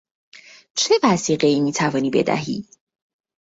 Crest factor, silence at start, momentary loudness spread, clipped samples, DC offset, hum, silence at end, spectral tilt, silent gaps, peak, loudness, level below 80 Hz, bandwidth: 18 dB; 0.75 s; 11 LU; under 0.1%; under 0.1%; none; 0.9 s; -4 dB/octave; none; -4 dBFS; -19 LUFS; -60 dBFS; 8 kHz